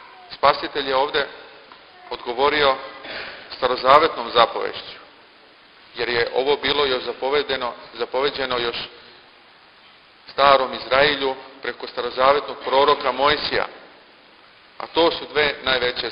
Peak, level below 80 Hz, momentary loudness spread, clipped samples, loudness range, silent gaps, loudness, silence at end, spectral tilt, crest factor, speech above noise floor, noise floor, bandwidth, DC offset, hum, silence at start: 0 dBFS; -52 dBFS; 16 LU; under 0.1%; 4 LU; none; -20 LUFS; 0 s; -6 dB/octave; 22 dB; 30 dB; -50 dBFS; 5.4 kHz; under 0.1%; none; 0 s